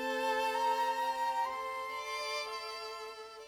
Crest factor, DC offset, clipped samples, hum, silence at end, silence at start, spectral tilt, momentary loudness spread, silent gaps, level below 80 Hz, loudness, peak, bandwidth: 14 dB; under 0.1%; under 0.1%; none; 0 s; 0 s; -0.5 dB/octave; 10 LU; none; -74 dBFS; -35 LUFS; -22 dBFS; over 20 kHz